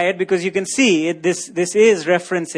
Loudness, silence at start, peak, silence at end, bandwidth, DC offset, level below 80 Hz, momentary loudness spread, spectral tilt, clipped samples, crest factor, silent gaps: -17 LUFS; 0 s; -4 dBFS; 0 s; 10.5 kHz; under 0.1%; -68 dBFS; 7 LU; -4 dB/octave; under 0.1%; 14 dB; none